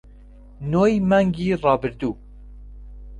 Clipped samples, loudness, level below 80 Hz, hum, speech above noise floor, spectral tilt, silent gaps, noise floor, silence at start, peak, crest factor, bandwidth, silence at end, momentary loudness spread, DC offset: under 0.1%; -20 LUFS; -42 dBFS; 50 Hz at -40 dBFS; 25 dB; -8 dB/octave; none; -44 dBFS; 0.6 s; -4 dBFS; 18 dB; 8.8 kHz; 0 s; 12 LU; under 0.1%